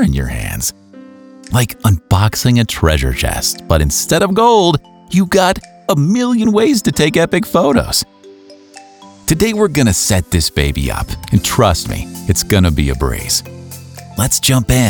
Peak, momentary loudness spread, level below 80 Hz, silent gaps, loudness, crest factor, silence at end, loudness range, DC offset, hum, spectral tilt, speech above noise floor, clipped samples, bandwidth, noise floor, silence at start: 0 dBFS; 8 LU; -26 dBFS; none; -14 LUFS; 14 dB; 0 s; 3 LU; under 0.1%; none; -4.5 dB/octave; 26 dB; under 0.1%; over 20 kHz; -39 dBFS; 0 s